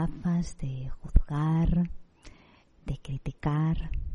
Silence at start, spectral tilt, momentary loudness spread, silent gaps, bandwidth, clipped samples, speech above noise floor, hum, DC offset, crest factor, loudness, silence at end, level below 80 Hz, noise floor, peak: 0 s; -8 dB/octave; 13 LU; none; 9.6 kHz; under 0.1%; 29 dB; none; under 0.1%; 24 dB; -30 LUFS; 0 s; -32 dBFS; -58 dBFS; -4 dBFS